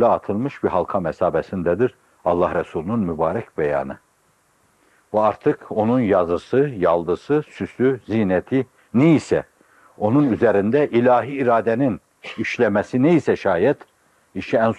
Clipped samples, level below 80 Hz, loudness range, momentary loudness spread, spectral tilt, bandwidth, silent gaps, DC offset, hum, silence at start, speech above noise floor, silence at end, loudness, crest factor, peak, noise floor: under 0.1%; -56 dBFS; 5 LU; 8 LU; -8 dB/octave; 10.5 kHz; none; under 0.1%; none; 0 s; 42 dB; 0 s; -20 LUFS; 16 dB; -4 dBFS; -61 dBFS